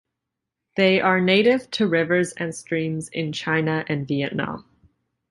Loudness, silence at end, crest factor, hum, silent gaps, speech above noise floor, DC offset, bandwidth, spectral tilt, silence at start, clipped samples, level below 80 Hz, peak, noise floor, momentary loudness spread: -22 LUFS; 0.7 s; 18 dB; none; none; 62 dB; under 0.1%; 11.5 kHz; -5.5 dB/octave; 0.75 s; under 0.1%; -60 dBFS; -4 dBFS; -83 dBFS; 11 LU